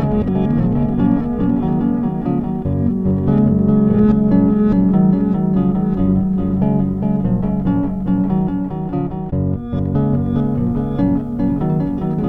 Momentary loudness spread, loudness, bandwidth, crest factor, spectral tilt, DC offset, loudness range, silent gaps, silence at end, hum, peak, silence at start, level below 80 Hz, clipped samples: 7 LU; -17 LUFS; 3.7 kHz; 14 dB; -12 dB/octave; 0.2%; 4 LU; none; 0 s; none; -2 dBFS; 0 s; -32 dBFS; under 0.1%